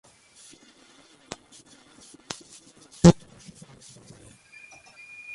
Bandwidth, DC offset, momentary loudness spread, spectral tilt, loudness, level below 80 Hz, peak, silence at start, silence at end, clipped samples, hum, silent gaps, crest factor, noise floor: 11.5 kHz; under 0.1%; 31 LU; -6.5 dB/octave; -20 LUFS; -48 dBFS; -2 dBFS; 3.05 s; 2.2 s; under 0.1%; none; none; 26 dB; -56 dBFS